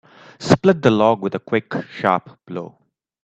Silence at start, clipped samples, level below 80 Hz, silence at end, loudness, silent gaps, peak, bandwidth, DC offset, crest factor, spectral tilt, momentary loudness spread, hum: 0.4 s; under 0.1%; -54 dBFS; 0.55 s; -18 LUFS; none; 0 dBFS; 8.8 kHz; under 0.1%; 20 dB; -6.5 dB/octave; 17 LU; none